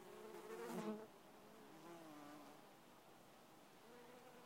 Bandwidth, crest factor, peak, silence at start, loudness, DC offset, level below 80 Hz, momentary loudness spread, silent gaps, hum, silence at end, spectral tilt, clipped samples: 16 kHz; 20 dB; -36 dBFS; 0 s; -57 LUFS; under 0.1%; -88 dBFS; 16 LU; none; none; 0 s; -5 dB/octave; under 0.1%